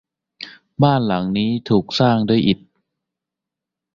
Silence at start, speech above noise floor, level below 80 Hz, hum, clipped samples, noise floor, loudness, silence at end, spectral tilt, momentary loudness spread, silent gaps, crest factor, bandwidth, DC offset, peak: 0.4 s; 68 dB; -52 dBFS; none; under 0.1%; -85 dBFS; -18 LUFS; 1.4 s; -7.5 dB/octave; 19 LU; none; 18 dB; 7.4 kHz; under 0.1%; -2 dBFS